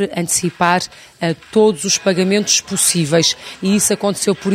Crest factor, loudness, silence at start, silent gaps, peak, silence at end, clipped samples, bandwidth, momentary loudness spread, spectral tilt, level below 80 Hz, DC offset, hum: 16 dB; -15 LUFS; 0 s; none; 0 dBFS; 0 s; under 0.1%; 16 kHz; 8 LU; -3.5 dB/octave; -54 dBFS; under 0.1%; none